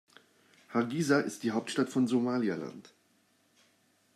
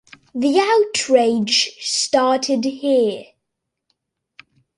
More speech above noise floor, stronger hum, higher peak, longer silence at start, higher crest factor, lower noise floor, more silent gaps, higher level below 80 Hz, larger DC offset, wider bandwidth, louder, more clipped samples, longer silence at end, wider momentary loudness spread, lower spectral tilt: second, 39 dB vs 62 dB; neither; second, -14 dBFS vs -2 dBFS; first, 0.7 s vs 0.35 s; about the same, 20 dB vs 18 dB; second, -70 dBFS vs -79 dBFS; neither; second, -82 dBFS vs -66 dBFS; neither; first, 13.5 kHz vs 11.5 kHz; second, -31 LUFS vs -17 LUFS; neither; second, 1.35 s vs 1.55 s; first, 10 LU vs 7 LU; first, -5.5 dB/octave vs -2.5 dB/octave